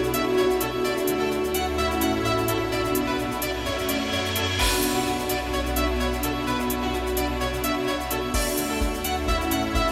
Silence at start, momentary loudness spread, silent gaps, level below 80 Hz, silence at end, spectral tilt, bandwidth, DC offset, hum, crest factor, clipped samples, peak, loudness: 0 s; 4 LU; none; -34 dBFS; 0 s; -4 dB/octave; 17 kHz; under 0.1%; none; 14 dB; under 0.1%; -10 dBFS; -25 LUFS